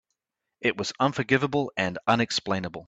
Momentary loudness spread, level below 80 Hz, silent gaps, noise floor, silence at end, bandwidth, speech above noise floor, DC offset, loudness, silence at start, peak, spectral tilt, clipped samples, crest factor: 5 LU; -62 dBFS; none; -84 dBFS; 0.05 s; 9 kHz; 58 dB; under 0.1%; -26 LUFS; 0.6 s; -6 dBFS; -4.5 dB/octave; under 0.1%; 20 dB